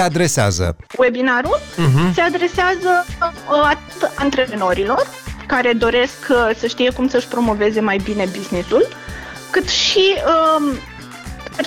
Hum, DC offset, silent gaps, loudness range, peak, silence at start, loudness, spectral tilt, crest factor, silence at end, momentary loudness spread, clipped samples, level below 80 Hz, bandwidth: none; under 0.1%; none; 1 LU; -6 dBFS; 0 s; -16 LUFS; -4.5 dB/octave; 12 dB; 0 s; 9 LU; under 0.1%; -38 dBFS; 19 kHz